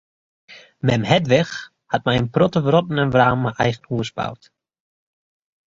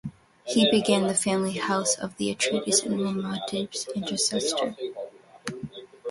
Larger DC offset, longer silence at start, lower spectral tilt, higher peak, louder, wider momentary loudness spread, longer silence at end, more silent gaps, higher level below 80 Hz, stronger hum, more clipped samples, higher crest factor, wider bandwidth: neither; first, 0.5 s vs 0.05 s; first, -6.5 dB/octave vs -3 dB/octave; first, -2 dBFS vs -8 dBFS; first, -19 LUFS vs -25 LUFS; second, 10 LU vs 17 LU; first, 1.3 s vs 0 s; neither; first, -50 dBFS vs -64 dBFS; neither; neither; about the same, 20 dB vs 18 dB; second, 7.6 kHz vs 11.5 kHz